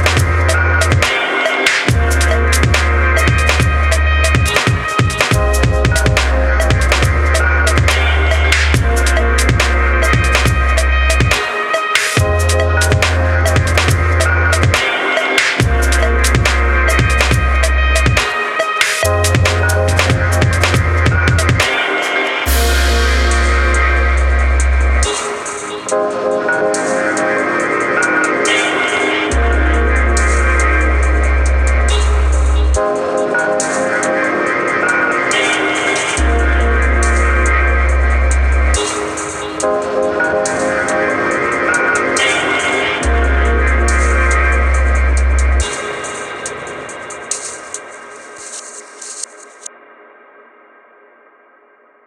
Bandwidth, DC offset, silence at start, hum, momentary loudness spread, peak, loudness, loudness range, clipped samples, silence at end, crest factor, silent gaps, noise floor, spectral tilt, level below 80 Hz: 15 kHz; under 0.1%; 0 s; none; 7 LU; 0 dBFS; -13 LUFS; 3 LU; under 0.1%; 2.4 s; 14 dB; none; -49 dBFS; -4 dB/octave; -16 dBFS